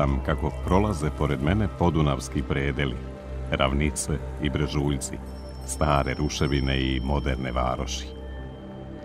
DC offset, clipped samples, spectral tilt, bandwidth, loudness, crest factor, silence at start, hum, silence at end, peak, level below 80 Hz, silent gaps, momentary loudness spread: under 0.1%; under 0.1%; -5.5 dB/octave; 15 kHz; -26 LUFS; 20 dB; 0 s; none; 0 s; -6 dBFS; -32 dBFS; none; 14 LU